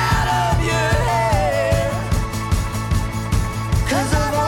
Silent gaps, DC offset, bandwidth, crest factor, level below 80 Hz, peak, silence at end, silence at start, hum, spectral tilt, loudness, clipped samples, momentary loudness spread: none; under 0.1%; 17.5 kHz; 12 dB; -26 dBFS; -6 dBFS; 0 s; 0 s; none; -5 dB/octave; -19 LUFS; under 0.1%; 4 LU